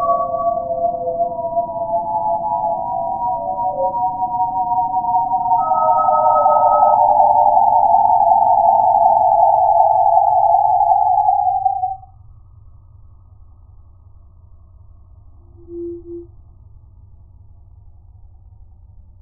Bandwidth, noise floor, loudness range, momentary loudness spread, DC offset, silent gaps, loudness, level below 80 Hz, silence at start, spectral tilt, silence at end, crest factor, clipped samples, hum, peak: 1.4 kHz; -43 dBFS; 8 LU; 9 LU; under 0.1%; none; -15 LUFS; -46 dBFS; 0 s; -7.5 dB/octave; 2.95 s; 16 dB; under 0.1%; none; 0 dBFS